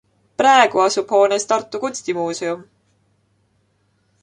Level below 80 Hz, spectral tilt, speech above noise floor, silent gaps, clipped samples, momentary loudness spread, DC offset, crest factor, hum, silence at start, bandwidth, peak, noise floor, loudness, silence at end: -66 dBFS; -2.5 dB/octave; 47 dB; none; under 0.1%; 13 LU; under 0.1%; 18 dB; none; 0.4 s; 11 kHz; -2 dBFS; -64 dBFS; -17 LUFS; 1.6 s